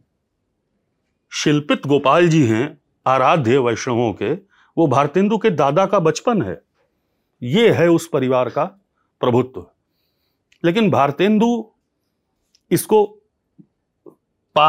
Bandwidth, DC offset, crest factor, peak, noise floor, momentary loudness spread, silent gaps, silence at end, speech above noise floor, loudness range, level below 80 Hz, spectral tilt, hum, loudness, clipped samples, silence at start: 16 kHz; under 0.1%; 16 dB; -2 dBFS; -72 dBFS; 11 LU; none; 0 s; 56 dB; 4 LU; -66 dBFS; -6 dB/octave; none; -17 LUFS; under 0.1%; 1.3 s